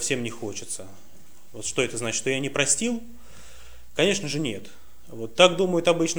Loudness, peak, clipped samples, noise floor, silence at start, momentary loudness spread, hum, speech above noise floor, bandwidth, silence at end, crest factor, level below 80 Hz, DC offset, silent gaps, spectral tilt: -24 LUFS; -2 dBFS; under 0.1%; -49 dBFS; 0 s; 16 LU; none; 24 dB; over 20 kHz; 0 s; 24 dB; -56 dBFS; 1%; none; -3 dB/octave